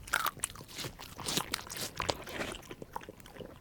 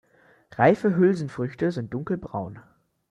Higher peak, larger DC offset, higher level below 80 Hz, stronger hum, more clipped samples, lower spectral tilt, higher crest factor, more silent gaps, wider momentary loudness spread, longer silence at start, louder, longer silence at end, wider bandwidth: second, -8 dBFS vs -4 dBFS; neither; about the same, -56 dBFS vs -60 dBFS; neither; neither; second, -2 dB/octave vs -8.5 dB/octave; first, 32 dB vs 20 dB; neither; about the same, 13 LU vs 14 LU; second, 0 s vs 0.6 s; second, -37 LUFS vs -24 LUFS; second, 0 s vs 0.5 s; first, over 20 kHz vs 10 kHz